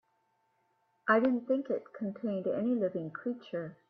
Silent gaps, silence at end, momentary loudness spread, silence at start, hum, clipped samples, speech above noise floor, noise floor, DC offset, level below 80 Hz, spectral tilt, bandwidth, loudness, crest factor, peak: none; 0.15 s; 11 LU; 1.05 s; none; under 0.1%; 43 dB; -75 dBFS; under 0.1%; -80 dBFS; -9 dB/octave; 5 kHz; -33 LUFS; 22 dB; -12 dBFS